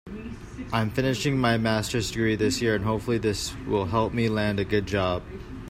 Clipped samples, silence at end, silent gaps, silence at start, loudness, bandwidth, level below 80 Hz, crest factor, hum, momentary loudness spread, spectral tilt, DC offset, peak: under 0.1%; 0 s; none; 0.05 s; -26 LUFS; 16 kHz; -44 dBFS; 16 dB; none; 9 LU; -5.5 dB/octave; under 0.1%; -10 dBFS